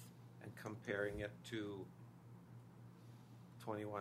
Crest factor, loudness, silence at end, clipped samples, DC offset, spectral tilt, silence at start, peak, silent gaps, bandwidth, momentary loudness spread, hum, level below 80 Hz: 22 dB; -48 LUFS; 0 s; under 0.1%; under 0.1%; -6 dB/octave; 0 s; -28 dBFS; none; 15.5 kHz; 17 LU; none; -70 dBFS